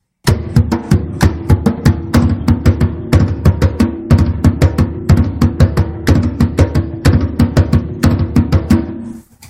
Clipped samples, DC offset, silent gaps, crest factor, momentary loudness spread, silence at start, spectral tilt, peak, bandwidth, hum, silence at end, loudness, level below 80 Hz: 0.3%; under 0.1%; none; 12 dB; 4 LU; 0.25 s; -7.5 dB/octave; 0 dBFS; 15.5 kHz; none; 0.05 s; -13 LUFS; -20 dBFS